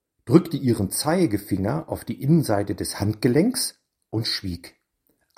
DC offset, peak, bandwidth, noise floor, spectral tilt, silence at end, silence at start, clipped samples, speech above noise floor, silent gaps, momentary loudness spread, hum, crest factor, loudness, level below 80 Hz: under 0.1%; 0 dBFS; 16 kHz; -70 dBFS; -5.5 dB/octave; 0.7 s; 0.25 s; under 0.1%; 47 dB; none; 9 LU; none; 22 dB; -23 LUFS; -52 dBFS